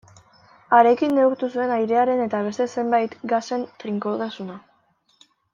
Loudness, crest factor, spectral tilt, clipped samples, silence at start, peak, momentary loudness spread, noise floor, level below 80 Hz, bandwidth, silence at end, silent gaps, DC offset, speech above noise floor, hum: -21 LUFS; 20 dB; -6 dB/octave; under 0.1%; 0.7 s; -2 dBFS; 12 LU; -64 dBFS; -70 dBFS; 7.4 kHz; 0.95 s; none; under 0.1%; 43 dB; none